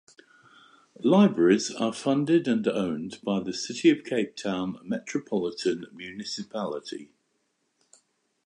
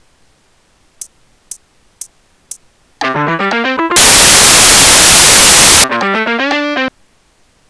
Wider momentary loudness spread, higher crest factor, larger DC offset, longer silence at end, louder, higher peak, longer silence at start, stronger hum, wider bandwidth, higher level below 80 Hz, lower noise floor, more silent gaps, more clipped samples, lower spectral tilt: about the same, 14 LU vs 13 LU; first, 18 dB vs 10 dB; neither; first, 1.4 s vs 0.8 s; second, -26 LUFS vs -5 LUFS; second, -8 dBFS vs 0 dBFS; about the same, 1 s vs 1 s; neither; about the same, 10.5 kHz vs 11 kHz; second, -70 dBFS vs -32 dBFS; first, -74 dBFS vs -52 dBFS; neither; neither; first, -5.5 dB/octave vs -0.5 dB/octave